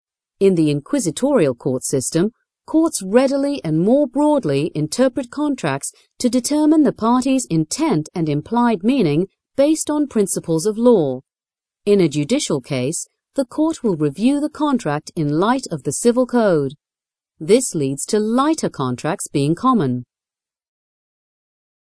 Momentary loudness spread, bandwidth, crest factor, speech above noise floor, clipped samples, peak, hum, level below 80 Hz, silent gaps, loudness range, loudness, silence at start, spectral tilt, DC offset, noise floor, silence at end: 7 LU; 13.5 kHz; 18 dB; over 73 dB; under 0.1%; 0 dBFS; none; -58 dBFS; none; 2 LU; -18 LUFS; 0.4 s; -5.5 dB/octave; under 0.1%; under -90 dBFS; 1.95 s